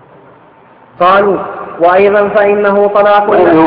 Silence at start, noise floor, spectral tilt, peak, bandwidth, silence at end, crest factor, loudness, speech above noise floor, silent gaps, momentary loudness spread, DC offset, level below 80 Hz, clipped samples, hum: 1 s; -40 dBFS; -9 dB/octave; 0 dBFS; 5.4 kHz; 0 s; 10 dB; -8 LUFS; 33 dB; none; 5 LU; under 0.1%; -48 dBFS; 0.2%; none